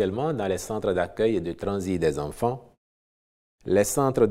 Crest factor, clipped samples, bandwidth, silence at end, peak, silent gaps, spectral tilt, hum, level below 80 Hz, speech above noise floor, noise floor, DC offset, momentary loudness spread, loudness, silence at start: 18 dB; under 0.1%; 16 kHz; 0 s; -8 dBFS; 2.77-3.58 s; -5.5 dB/octave; none; -50 dBFS; over 65 dB; under -90 dBFS; under 0.1%; 7 LU; -26 LUFS; 0 s